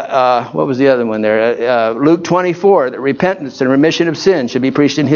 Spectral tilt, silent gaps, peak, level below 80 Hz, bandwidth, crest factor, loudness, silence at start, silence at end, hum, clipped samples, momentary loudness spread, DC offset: -6 dB/octave; none; 0 dBFS; -56 dBFS; 7.2 kHz; 12 dB; -13 LUFS; 0 s; 0 s; none; under 0.1%; 4 LU; under 0.1%